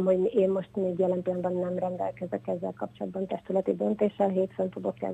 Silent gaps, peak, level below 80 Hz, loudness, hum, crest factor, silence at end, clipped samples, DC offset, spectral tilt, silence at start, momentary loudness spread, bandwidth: none; -12 dBFS; -66 dBFS; -29 LUFS; none; 16 dB; 0 s; under 0.1%; under 0.1%; -9.5 dB/octave; 0 s; 9 LU; 8.6 kHz